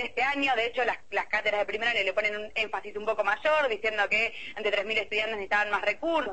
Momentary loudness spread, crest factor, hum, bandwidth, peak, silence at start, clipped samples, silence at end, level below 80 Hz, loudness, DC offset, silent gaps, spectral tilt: 5 LU; 16 dB; none; 8.6 kHz; -12 dBFS; 0 s; under 0.1%; 0 s; -62 dBFS; -27 LUFS; 0.5%; none; -3 dB/octave